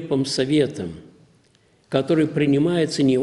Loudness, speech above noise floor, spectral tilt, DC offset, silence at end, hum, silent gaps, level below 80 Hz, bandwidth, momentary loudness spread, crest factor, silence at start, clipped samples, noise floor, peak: -20 LUFS; 39 dB; -6 dB/octave; under 0.1%; 0 s; none; none; -56 dBFS; 11.5 kHz; 12 LU; 18 dB; 0 s; under 0.1%; -59 dBFS; -4 dBFS